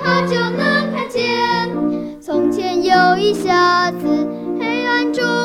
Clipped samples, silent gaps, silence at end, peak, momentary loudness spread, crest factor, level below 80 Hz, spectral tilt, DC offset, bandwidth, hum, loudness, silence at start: under 0.1%; none; 0 s; -2 dBFS; 8 LU; 14 dB; -54 dBFS; -5 dB/octave; under 0.1%; 15 kHz; none; -16 LUFS; 0 s